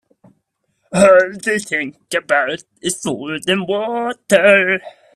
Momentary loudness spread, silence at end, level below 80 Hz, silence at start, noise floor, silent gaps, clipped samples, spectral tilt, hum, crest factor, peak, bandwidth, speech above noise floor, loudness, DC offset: 12 LU; 0.25 s; -58 dBFS; 0.9 s; -68 dBFS; none; under 0.1%; -3.5 dB/octave; none; 16 dB; 0 dBFS; 13.5 kHz; 52 dB; -16 LUFS; under 0.1%